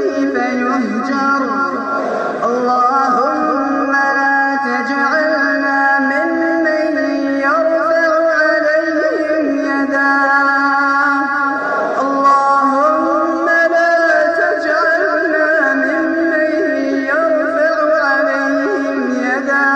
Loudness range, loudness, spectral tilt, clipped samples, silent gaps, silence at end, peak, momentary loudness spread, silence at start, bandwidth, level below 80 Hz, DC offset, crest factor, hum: 2 LU; -14 LUFS; -4.5 dB/octave; under 0.1%; none; 0 s; -2 dBFS; 5 LU; 0 s; 9.2 kHz; -62 dBFS; under 0.1%; 12 dB; none